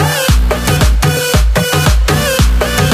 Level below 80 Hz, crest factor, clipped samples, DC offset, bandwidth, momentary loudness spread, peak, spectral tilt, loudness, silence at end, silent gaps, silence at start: -14 dBFS; 10 dB; under 0.1%; under 0.1%; 15.5 kHz; 1 LU; 0 dBFS; -4.5 dB/octave; -11 LUFS; 0 s; none; 0 s